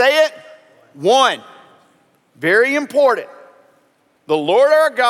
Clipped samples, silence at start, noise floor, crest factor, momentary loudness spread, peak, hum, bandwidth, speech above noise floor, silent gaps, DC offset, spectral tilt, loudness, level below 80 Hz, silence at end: under 0.1%; 0 s; -58 dBFS; 16 dB; 10 LU; 0 dBFS; none; 14.5 kHz; 44 dB; none; under 0.1%; -3 dB/octave; -15 LUFS; -78 dBFS; 0 s